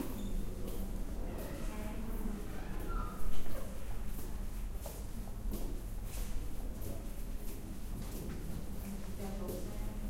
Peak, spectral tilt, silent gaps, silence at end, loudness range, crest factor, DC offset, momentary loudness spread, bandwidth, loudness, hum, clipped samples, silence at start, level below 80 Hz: -18 dBFS; -6 dB/octave; none; 0 s; 2 LU; 16 dB; under 0.1%; 4 LU; 16 kHz; -44 LUFS; none; under 0.1%; 0 s; -40 dBFS